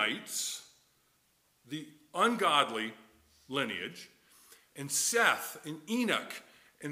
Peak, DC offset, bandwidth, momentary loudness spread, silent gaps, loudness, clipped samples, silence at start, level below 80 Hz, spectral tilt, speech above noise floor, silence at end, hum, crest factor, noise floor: -10 dBFS; under 0.1%; 16 kHz; 18 LU; none; -31 LUFS; under 0.1%; 0 s; -82 dBFS; -2 dB/octave; 39 dB; 0 s; none; 24 dB; -72 dBFS